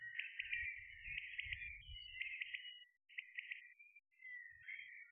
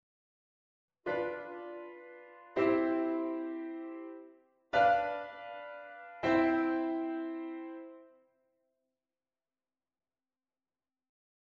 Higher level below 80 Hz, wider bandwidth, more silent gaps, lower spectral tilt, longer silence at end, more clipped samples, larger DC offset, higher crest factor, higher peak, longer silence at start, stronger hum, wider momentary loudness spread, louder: about the same, -70 dBFS vs -72 dBFS; second, 3.5 kHz vs 7 kHz; neither; second, 0.5 dB/octave vs -6.5 dB/octave; second, 0 s vs 3.45 s; neither; neither; about the same, 22 dB vs 20 dB; second, -30 dBFS vs -16 dBFS; second, 0 s vs 1.05 s; neither; second, 12 LU vs 20 LU; second, -48 LUFS vs -34 LUFS